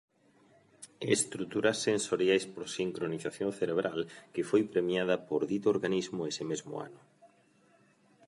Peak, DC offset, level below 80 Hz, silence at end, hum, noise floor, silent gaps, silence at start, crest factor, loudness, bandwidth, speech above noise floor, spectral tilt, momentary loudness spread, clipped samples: -12 dBFS; under 0.1%; -74 dBFS; 1 s; none; -66 dBFS; none; 0.8 s; 20 dB; -32 LUFS; 11.5 kHz; 34 dB; -4 dB/octave; 10 LU; under 0.1%